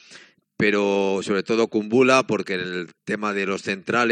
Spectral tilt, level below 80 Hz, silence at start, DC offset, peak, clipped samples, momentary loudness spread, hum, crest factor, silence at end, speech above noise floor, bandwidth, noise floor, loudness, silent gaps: -5 dB/octave; -68 dBFS; 0.1 s; under 0.1%; -2 dBFS; under 0.1%; 10 LU; none; 20 dB; 0 s; 28 dB; 10 kHz; -49 dBFS; -22 LUFS; none